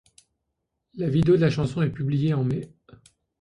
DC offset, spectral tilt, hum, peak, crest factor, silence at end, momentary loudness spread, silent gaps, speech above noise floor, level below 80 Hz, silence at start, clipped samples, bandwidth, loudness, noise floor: under 0.1%; -8.5 dB/octave; none; -8 dBFS; 16 dB; 0.75 s; 11 LU; none; 57 dB; -52 dBFS; 0.95 s; under 0.1%; 10.5 kHz; -24 LUFS; -80 dBFS